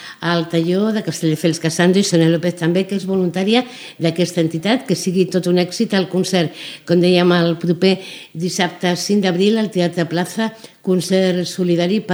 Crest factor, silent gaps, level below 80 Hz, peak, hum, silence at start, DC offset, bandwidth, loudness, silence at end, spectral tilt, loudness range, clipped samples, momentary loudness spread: 16 dB; none; -64 dBFS; 0 dBFS; none; 0 s; under 0.1%; over 20 kHz; -17 LUFS; 0 s; -5.5 dB/octave; 2 LU; under 0.1%; 7 LU